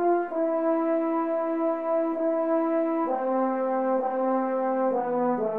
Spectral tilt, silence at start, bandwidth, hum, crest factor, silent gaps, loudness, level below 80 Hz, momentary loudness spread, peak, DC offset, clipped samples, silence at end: -9 dB/octave; 0 s; 3.6 kHz; none; 10 dB; none; -26 LUFS; -76 dBFS; 2 LU; -14 dBFS; 0.2%; under 0.1%; 0 s